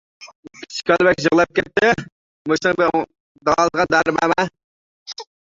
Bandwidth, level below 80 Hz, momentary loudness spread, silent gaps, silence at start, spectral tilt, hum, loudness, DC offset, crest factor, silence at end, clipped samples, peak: 7.8 kHz; -52 dBFS; 16 LU; 0.35-0.43 s, 2.12-2.45 s, 3.20-3.35 s, 4.64-5.06 s; 0.2 s; -4.5 dB/octave; none; -18 LUFS; under 0.1%; 18 dB; 0.2 s; under 0.1%; -2 dBFS